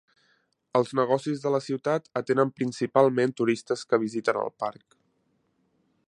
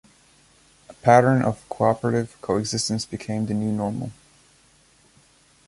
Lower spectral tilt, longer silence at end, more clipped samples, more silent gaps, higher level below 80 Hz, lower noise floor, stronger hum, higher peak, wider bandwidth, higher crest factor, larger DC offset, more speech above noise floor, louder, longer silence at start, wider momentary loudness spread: about the same, -6 dB/octave vs -5.5 dB/octave; second, 1.35 s vs 1.55 s; neither; neither; second, -74 dBFS vs -56 dBFS; first, -71 dBFS vs -57 dBFS; neither; second, -6 dBFS vs -2 dBFS; about the same, 11 kHz vs 11.5 kHz; about the same, 22 dB vs 22 dB; neither; first, 46 dB vs 36 dB; second, -26 LUFS vs -22 LUFS; second, 0.75 s vs 0.9 s; second, 7 LU vs 12 LU